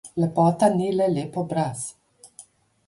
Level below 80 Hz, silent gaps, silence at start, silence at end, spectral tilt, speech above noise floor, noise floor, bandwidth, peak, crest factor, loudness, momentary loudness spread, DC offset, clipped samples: -62 dBFS; none; 0.05 s; 0.6 s; -7 dB/octave; 29 dB; -51 dBFS; 11.5 kHz; -6 dBFS; 18 dB; -23 LUFS; 10 LU; under 0.1%; under 0.1%